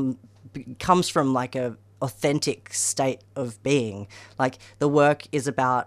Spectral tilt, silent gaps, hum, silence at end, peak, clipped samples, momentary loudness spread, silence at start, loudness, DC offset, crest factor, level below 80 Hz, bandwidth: -4.5 dB/octave; none; none; 0 s; -4 dBFS; under 0.1%; 16 LU; 0 s; -24 LUFS; under 0.1%; 20 dB; -58 dBFS; 15.5 kHz